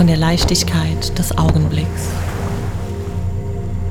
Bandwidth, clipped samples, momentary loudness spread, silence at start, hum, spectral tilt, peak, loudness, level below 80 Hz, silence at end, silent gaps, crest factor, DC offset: 17.5 kHz; under 0.1%; 9 LU; 0 s; none; -5 dB/octave; -2 dBFS; -18 LUFS; -26 dBFS; 0 s; none; 14 dB; under 0.1%